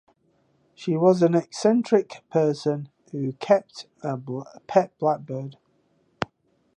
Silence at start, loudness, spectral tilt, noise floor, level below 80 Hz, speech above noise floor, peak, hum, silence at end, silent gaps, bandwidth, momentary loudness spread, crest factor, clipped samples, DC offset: 0.8 s; -24 LUFS; -7 dB/octave; -66 dBFS; -68 dBFS; 43 dB; -4 dBFS; none; 0.5 s; none; 10.5 kHz; 14 LU; 20 dB; under 0.1%; under 0.1%